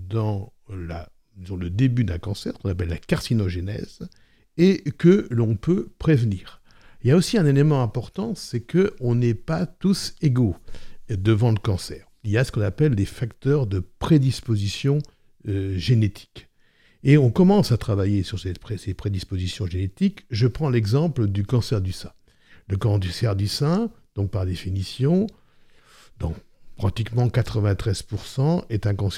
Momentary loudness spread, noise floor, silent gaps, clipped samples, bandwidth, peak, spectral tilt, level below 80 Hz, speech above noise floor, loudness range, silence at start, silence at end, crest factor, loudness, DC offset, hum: 13 LU; -58 dBFS; none; under 0.1%; 14 kHz; -4 dBFS; -7 dB/octave; -44 dBFS; 36 dB; 5 LU; 0 s; 0 s; 18 dB; -23 LUFS; under 0.1%; none